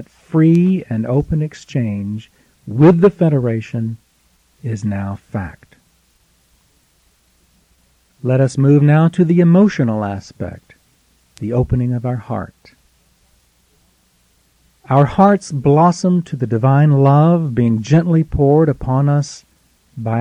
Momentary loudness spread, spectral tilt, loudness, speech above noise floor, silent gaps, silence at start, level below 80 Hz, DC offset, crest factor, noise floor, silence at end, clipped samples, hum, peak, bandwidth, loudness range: 16 LU; -8.5 dB/octave; -15 LUFS; 44 dB; none; 0 s; -40 dBFS; under 0.1%; 14 dB; -57 dBFS; 0 s; under 0.1%; none; -2 dBFS; 9.8 kHz; 14 LU